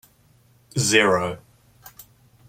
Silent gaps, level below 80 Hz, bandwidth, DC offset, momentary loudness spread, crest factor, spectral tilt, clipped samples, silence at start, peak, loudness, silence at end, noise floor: none; -60 dBFS; 16.5 kHz; under 0.1%; 15 LU; 24 dB; -3 dB/octave; under 0.1%; 0.75 s; -2 dBFS; -20 LUFS; 1.1 s; -58 dBFS